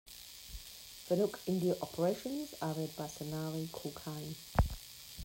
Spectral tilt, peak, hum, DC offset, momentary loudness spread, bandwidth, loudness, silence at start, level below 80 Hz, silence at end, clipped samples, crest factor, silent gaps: -5.5 dB/octave; -18 dBFS; none; under 0.1%; 14 LU; 16.5 kHz; -38 LUFS; 0.05 s; -48 dBFS; 0 s; under 0.1%; 20 dB; none